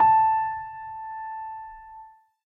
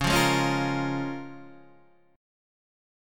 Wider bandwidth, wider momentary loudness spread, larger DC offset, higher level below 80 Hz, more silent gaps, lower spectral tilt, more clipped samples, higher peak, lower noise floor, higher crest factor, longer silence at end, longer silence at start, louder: second, 3.7 kHz vs 17.5 kHz; first, 24 LU vs 21 LU; neither; second, -60 dBFS vs -48 dBFS; neither; first, -6.5 dB/octave vs -4.5 dB/octave; neither; about the same, -10 dBFS vs -10 dBFS; second, -49 dBFS vs -59 dBFS; second, 14 dB vs 20 dB; second, 0.45 s vs 1 s; about the same, 0 s vs 0 s; about the same, -26 LUFS vs -26 LUFS